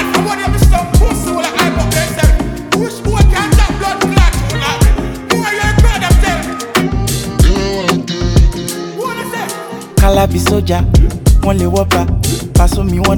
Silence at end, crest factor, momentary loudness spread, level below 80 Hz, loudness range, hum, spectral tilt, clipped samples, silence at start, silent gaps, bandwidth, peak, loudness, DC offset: 0 s; 12 dB; 6 LU; -14 dBFS; 2 LU; none; -5 dB/octave; under 0.1%; 0 s; none; 18.5 kHz; 0 dBFS; -13 LUFS; under 0.1%